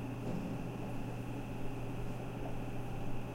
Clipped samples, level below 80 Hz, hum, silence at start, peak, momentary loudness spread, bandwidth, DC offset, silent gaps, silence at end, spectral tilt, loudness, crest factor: under 0.1%; -48 dBFS; none; 0 s; -26 dBFS; 2 LU; 16 kHz; under 0.1%; none; 0 s; -7.5 dB/octave; -42 LUFS; 12 dB